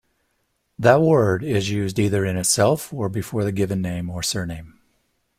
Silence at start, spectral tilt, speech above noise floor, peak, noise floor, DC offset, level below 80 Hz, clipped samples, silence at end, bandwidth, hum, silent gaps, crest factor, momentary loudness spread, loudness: 0.8 s; -5 dB/octave; 50 dB; -2 dBFS; -70 dBFS; under 0.1%; -50 dBFS; under 0.1%; 0.7 s; 16 kHz; none; none; 20 dB; 10 LU; -21 LUFS